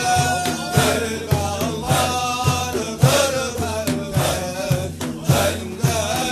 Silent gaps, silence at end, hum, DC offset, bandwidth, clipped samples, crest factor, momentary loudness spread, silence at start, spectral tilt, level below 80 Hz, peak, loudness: none; 0 s; none; under 0.1%; 14 kHz; under 0.1%; 18 dB; 6 LU; 0 s; -4.5 dB/octave; -40 dBFS; -2 dBFS; -20 LUFS